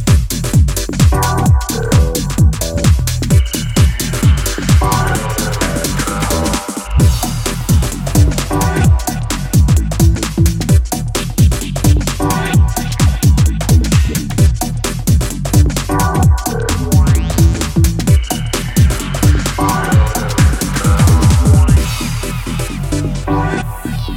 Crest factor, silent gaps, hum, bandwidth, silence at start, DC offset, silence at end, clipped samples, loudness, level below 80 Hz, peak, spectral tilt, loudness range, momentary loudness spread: 12 dB; none; none; 17 kHz; 0 s; under 0.1%; 0 s; under 0.1%; -14 LUFS; -16 dBFS; 0 dBFS; -5.5 dB/octave; 2 LU; 6 LU